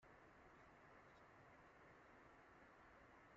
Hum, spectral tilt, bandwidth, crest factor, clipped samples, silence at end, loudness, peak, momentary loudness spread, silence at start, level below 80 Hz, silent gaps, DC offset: none; -4 dB/octave; 7.4 kHz; 12 dB; under 0.1%; 0 s; -67 LUFS; -54 dBFS; 0 LU; 0 s; -82 dBFS; none; under 0.1%